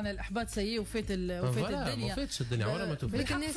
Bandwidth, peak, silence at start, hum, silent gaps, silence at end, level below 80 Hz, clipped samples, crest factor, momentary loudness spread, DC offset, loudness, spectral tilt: 11 kHz; -22 dBFS; 0 s; none; none; 0 s; -46 dBFS; under 0.1%; 12 dB; 3 LU; under 0.1%; -34 LUFS; -5 dB/octave